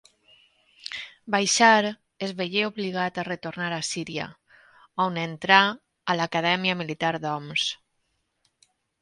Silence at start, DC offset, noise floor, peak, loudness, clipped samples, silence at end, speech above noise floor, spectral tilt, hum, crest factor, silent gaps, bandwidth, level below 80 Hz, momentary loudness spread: 0.85 s; under 0.1%; -74 dBFS; -2 dBFS; -24 LUFS; under 0.1%; 1.25 s; 50 dB; -3 dB/octave; none; 26 dB; none; 11.5 kHz; -70 dBFS; 17 LU